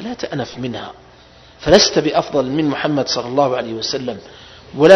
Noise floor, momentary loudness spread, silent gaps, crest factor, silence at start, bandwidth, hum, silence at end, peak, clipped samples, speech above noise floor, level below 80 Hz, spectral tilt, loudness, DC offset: -45 dBFS; 17 LU; none; 16 dB; 0 s; 11 kHz; none; 0 s; 0 dBFS; 0.3%; 27 dB; -46 dBFS; -4 dB/octave; -17 LUFS; under 0.1%